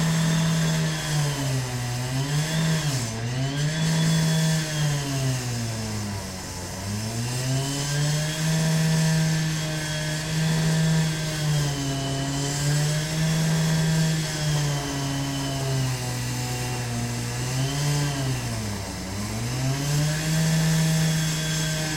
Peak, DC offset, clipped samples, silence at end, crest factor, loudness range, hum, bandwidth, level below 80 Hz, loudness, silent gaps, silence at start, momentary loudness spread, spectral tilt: -12 dBFS; under 0.1%; under 0.1%; 0 s; 12 dB; 3 LU; none; 16.5 kHz; -44 dBFS; -25 LUFS; none; 0 s; 7 LU; -4.5 dB/octave